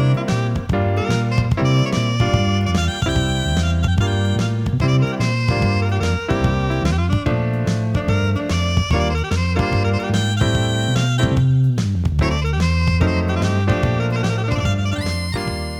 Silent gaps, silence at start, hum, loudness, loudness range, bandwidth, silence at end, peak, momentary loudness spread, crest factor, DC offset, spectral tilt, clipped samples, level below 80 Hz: none; 0 s; none; -19 LUFS; 1 LU; 13 kHz; 0 s; -2 dBFS; 3 LU; 16 dB; under 0.1%; -6 dB/octave; under 0.1%; -28 dBFS